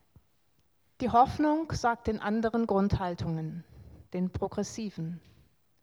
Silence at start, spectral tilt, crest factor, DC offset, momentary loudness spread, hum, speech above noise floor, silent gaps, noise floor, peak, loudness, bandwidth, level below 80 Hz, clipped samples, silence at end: 1 s; -6.5 dB/octave; 20 dB; under 0.1%; 15 LU; none; 43 dB; none; -72 dBFS; -10 dBFS; -30 LUFS; 12.5 kHz; -50 dBFS; under 0.1%; 0.65 s